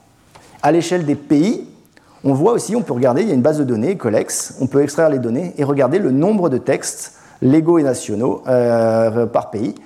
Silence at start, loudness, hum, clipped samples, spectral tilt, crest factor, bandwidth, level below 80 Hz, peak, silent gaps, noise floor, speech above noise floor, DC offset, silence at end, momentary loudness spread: 0.65 s; -16 LUFS; none; under 0.1%; -6 dB/octave; 14 dB; 15 kHz; -60 dBFS; -2 dBFS; none; -48 dBFS; 32 dB; under 0.1%; 0.1 s; 6 LU